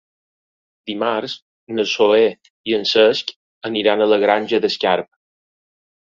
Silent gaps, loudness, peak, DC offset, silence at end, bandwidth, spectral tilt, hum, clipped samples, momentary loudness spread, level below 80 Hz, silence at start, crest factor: 1.42-1.67 s, 2.50-2.64 s, 3.36-3.61 s; -17 LUFS; -2 dBFS; under 0.1%; 1.1 s; 7.4 kHz; -4 dB/octave; none; under 0.1%; 17 LU; -64 dBFS; 0.85 s; 18 dB